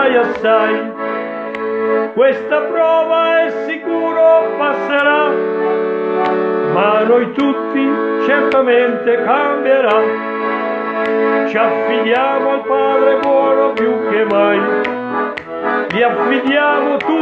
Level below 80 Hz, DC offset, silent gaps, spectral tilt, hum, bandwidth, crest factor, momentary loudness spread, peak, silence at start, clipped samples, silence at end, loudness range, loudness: -62 dBFS; under 0.1%; none; -6.5 dB/octave; none; 6.4 kHz; 14 dB; 7 LU; 0 dBFS; 0 s; under 0.1%; 0 s; 1 LU; -14 LUFS